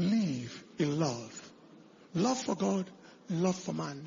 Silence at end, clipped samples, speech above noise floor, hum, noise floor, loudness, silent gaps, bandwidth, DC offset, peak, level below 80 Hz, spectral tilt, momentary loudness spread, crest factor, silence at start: 0 s; under 0.1%; 24 dB; none; -56 dBFS; -33 LUFS; none; 7.6 kHz; under 0.1%; -18 dBFS; -72 dBFS; -5.5 dB/octave; 15 LU; 16 dB; 0 s